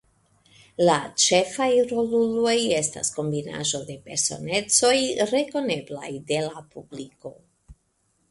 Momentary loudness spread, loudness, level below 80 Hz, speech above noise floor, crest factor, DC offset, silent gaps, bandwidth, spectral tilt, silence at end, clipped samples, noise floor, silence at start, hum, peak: 20 LU; -23 LUFS; -62 dBFS; 46 dB; 18 dB; under 0.1%; none; 11.5 kHz; -3 dB/octave; 0.55 s; under 0.1%; -69 dBFS; 0.8 s; none; -6 dBFS